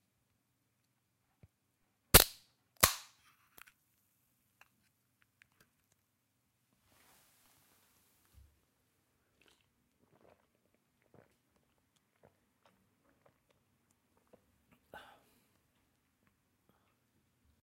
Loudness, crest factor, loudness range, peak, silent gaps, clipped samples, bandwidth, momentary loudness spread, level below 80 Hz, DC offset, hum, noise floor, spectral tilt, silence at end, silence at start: -28 LUFS; 38 dB; 7 LU; -4 dBFS; none; under 0.1%; 16 kHz; 10 LU; -54 dBFS; under 0.1%; none; -81 dBFS; -2 dB/octave; 14.65 s; 2.15 s